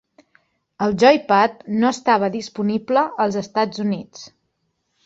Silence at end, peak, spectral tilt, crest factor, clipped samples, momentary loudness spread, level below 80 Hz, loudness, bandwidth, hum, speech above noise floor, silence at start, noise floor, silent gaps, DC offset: 0.75 s; -2 dBFS; -5.5 dB/octave; 18 dB; under 0.1%; 10 LU; -60 dBFS; -19 LUFS; 7.8 kHz; none; 53 dB; 0.8 s; -71 dBFS; none; under 0.1%